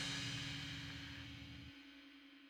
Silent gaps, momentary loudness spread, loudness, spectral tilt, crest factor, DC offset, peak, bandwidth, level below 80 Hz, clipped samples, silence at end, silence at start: none; 16 LU; -47 LUFS; -3 dB/octave; 18 dB; under 0.1%; -32 dBFS; 17 kHz; -64 dBFS; under 0.1%; 0 s; 0 s